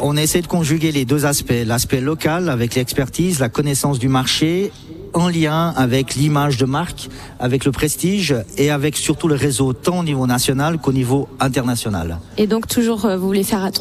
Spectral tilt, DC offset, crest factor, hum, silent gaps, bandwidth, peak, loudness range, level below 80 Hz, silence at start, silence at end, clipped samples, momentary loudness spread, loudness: -5 dB/octave; under 0.1%; 14 dB; none; none; 15 kHz; -4 dBFS; 1 LU; -40 dBFS; 0 s; 0 s; under 0.1%; 4 LU; -18 LUFS